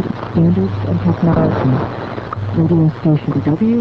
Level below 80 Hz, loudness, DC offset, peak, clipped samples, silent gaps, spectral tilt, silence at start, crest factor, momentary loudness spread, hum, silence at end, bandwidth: -36 dBFS; -16 LUFS; under 0.1%; -2 dBFS; under 0.1%; none; -10.5 dB/octave; 0 s; 12 dB; 8 LU; none; 0 s; 5.8 kHz